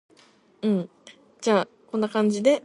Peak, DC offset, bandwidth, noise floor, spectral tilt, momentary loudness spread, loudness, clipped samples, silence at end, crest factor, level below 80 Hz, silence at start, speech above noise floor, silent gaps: -6 dBFS; under 0.1%; 11.5 kHz; -57 dBFS; -5.5 dB/octave; 9 LU; -25 LUFS; under 0.1%; 0.05 s; 18 dB; -72 dBFS; 0.65 s; 35 dB; none